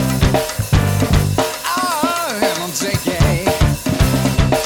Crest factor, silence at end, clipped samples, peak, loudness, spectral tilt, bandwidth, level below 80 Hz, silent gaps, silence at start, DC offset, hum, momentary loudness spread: 14 dB; 0 s; under 0.1%; -2 dBFS; -17 LUFS; -5 dB/octave; 19 kHz; -24 dBFS; none; 0 s; under 0.1%; none; 3 LU